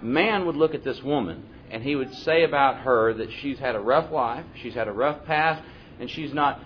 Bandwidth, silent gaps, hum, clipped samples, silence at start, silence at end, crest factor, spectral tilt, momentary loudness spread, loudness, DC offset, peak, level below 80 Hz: 5.4 kHz; none; none; under 0.1%; 0 s; 0 s; 18 dB; -7 dB/octave; 13 LU; -24 LUFS; under 0.1%; -6 dBFS; -54 dBFS